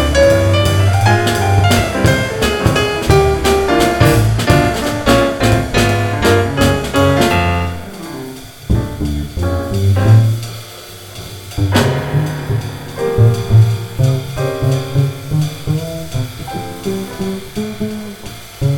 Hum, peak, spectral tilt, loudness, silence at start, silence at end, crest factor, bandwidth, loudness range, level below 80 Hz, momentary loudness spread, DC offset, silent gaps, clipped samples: none; 0 dBFS; -6 dB/octave; -14 LUFS; 0 s; 0 s; 14 dB; 18.5 kHz; 6 LU; -28 dBFS; 15 LU; under 0.1%; none; under 0.1%